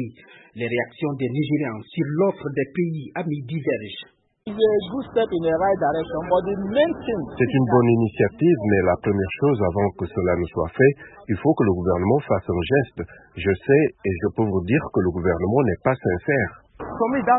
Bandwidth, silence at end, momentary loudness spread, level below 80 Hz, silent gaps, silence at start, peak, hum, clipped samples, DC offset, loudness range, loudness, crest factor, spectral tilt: 4.1 kHz; 0 s; 9 LU; -48 dBFS; none; 0 s; -4 dBFS; none; under 0.1%; under 0.1%; 5 LU; -22 LUFS; 18 dB; -12 dB/octave